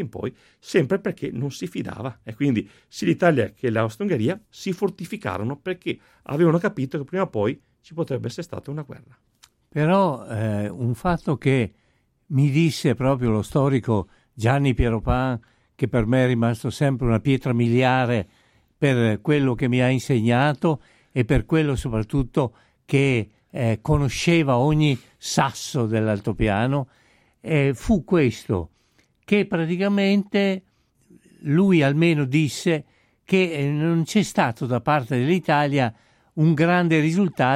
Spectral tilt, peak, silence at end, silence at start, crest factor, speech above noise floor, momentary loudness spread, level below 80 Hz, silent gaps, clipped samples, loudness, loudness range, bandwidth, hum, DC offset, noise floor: -6.5 dB/octave; -6 dBFS; 0 s; 0 s; 16 dB; 42 dB; 11 LU; -42 dBFS; none; under 0.1%; -22 LUFS; 4 LU; 14.5 kHz; none; under 0.1%; -63 dBFS